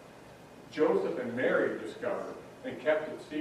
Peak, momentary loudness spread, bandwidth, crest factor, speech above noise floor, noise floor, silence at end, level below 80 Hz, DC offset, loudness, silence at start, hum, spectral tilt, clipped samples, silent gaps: -14 dBFS; 23 LU; 13.5 kHz; 18 dB; 20 dB; -52 dBFS; 0 s; -70 dBFS; under 0.1%; -32 LUFS; 0 s; none; -6 dB/octave; under 0.1%; none